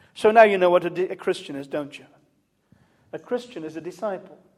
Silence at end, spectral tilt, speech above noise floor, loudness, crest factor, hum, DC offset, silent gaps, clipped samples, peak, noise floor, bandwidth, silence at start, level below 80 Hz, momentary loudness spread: 0.4 s; -5.5 dB/octave; 44 dB; -22 LUFS; 22 dB; none; under 0.1%; none; under 0.1%; -2 dBFS; -66 dBFS; 12.5 kHz; 0.15 s; -72 dBFS; 21 LU